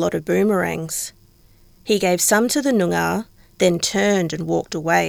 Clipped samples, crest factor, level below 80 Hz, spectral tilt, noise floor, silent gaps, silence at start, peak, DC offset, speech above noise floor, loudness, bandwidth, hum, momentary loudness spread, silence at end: under 0.1%; 16 dB; -52 dBFS; -4 dB/octave; -51 dBFS; none; 0 s; -4 dBFS; under 0.1%; 32 dB; -19 LUFS; 19 kHz; none; 10 LU; 0 s